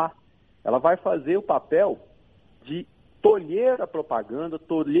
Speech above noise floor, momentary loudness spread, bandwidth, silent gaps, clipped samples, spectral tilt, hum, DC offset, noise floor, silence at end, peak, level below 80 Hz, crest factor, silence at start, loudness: 37 dB; 14 LU; 3.8 kHz; none; under 0.1%; -9 dB/octave; none; under 0.1%; -59 dBFS; 0 s; -6 dBFS; -64 dBFS; 18 dB; 0 s; -24 LUFS